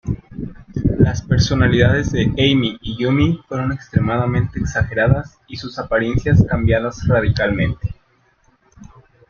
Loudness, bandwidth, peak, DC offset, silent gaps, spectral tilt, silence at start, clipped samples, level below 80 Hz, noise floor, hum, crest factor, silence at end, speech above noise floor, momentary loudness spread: -18 LUFS; 7 kHz; 0 dBFS; under 0.1%; none; -6.5 dB/octave; 0.05 s; under 0.1%; -32 dBFS; -58 dBFS; none; 16 dB; 0.45 s; 42 dB; 13 LU